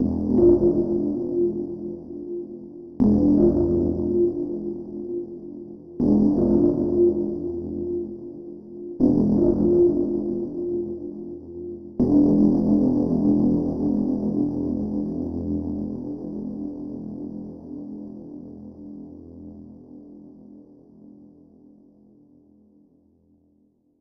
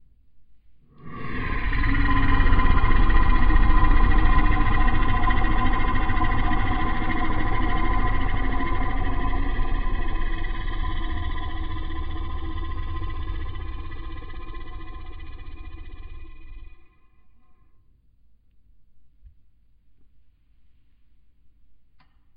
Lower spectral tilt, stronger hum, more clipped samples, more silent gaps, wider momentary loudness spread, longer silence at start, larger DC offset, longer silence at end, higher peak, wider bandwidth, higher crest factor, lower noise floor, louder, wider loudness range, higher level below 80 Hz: first, -12.5 dB/octave vs -9.5 dB/octave; neither; neither; neither; about the same, 21 LU vs 20 LU; second, 0 s vs 0.35 s; neither; first, 2.9 s vs 0.6 s; about the same, -6 dBFS vs -4 dBFS; first, 5 kHz vs 4.5 kHz; about the same, 18 dB vs 16 dB; first, -63 dBFS vs -56 dBFS; first, -22 LUFS vs -26 LUFS; second, 16 LU vs 19 LU; second, -44 dBFS vs -24 dBFS